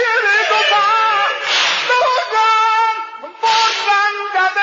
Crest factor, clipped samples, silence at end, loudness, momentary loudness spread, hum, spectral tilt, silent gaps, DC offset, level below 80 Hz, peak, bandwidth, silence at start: 12 dB; under 0.1%; 0 s; -13 LUFS; 4 LU; none; 1 dB/octave; none; under 0.1%; -70 dBFS; -2 dBFS; 7.6 kHz; 0 s